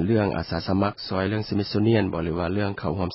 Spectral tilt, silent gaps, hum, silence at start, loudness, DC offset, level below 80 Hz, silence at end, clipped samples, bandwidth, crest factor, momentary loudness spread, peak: -11 dB/octave; none; none; 0 s; -25 LUFS; under 0.1%; -42 dBFS; 0 s; under 0.1%; 5.8 kHz; 16 dB; 6 LU; -8 dBFS